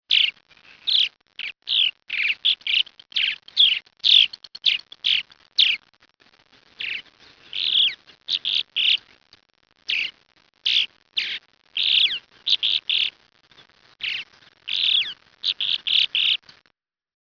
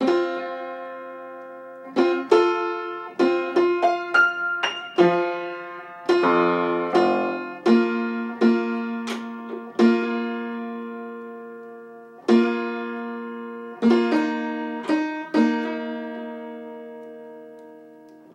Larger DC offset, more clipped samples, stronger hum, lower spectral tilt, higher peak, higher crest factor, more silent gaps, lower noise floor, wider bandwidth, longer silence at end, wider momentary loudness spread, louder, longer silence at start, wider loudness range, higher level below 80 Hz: neither; neither; neither; second, 1.5 dB/octave vs -6 dB/octave; about the same, -4 dBFS vs -4 dBFS; about the same, 20 dB vs 20 dB; neither; first, -68 dBFS vs -47 dBFS; second, 5.4 kHz vs 9 kHz; first, 0.9 s vs 0.2 s; second, 12 LU vs 19 LU; first, -20 LUFS vs -23 LUFS; about the same, 0.1 s vs 0 s; about the same, 5 LU vs 6 LU; about the same, -72 dBFS vs -74 dBFS